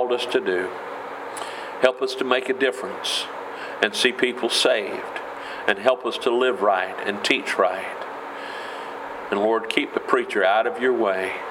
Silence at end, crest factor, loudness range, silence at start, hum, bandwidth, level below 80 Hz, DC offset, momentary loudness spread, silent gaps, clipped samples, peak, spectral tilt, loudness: 0 s; 22 dB; 3 LU; 0 s; none; 16.5 kHz; -70 dBFS; under 0.1%; 13 LU; none; under 0.1%; 0 dBFS; -2.5 dB/octave; -23 LUFS